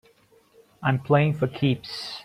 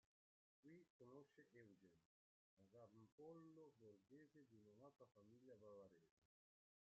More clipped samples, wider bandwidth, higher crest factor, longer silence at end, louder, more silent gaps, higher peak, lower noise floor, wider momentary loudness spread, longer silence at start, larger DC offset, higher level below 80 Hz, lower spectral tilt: neither; first, 11 kHz vs 6.8 kHz; about the same, 18 dB vs 16 dB; second, 0 s vs 0.7 s; first, -24 LUFS vs -67 LUFS; second, none vs 0.90-1.00 s, 2.05-2.57 s, 3.12-3.18 s, 6.11-6.22 s; first, -6 dBFS vs -52 dBFS; second, -59 dBFS vs under -90 dBFS; first, 8 LU vs 5 LU; first, 0.8 s vs 0.65 s; neither; first, -60 dBFS vs under -90 dBFS; about the same, -7.5 dB/octave vs -7 dB/octave